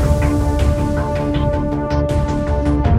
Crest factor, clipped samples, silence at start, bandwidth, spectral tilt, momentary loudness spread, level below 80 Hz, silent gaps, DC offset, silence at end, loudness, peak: 14 dB; under 0.1%; 0 s; 13 kHz; -8 dB/octave; 3 LU; -20 dBFS; none; under 0.1%; 0 s; -18 LUFS; -2 dBFS